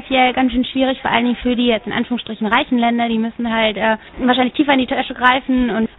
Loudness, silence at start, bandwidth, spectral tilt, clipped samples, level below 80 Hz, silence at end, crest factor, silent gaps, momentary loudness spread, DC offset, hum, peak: -17 LUFS; 0 s; 4.1 kHz; -7.5 dB/octave; under 0.1%; -42 dBFS; 0.1 s; 16 dB; none; 5 LU; under 0.1%; none; 0 dBFS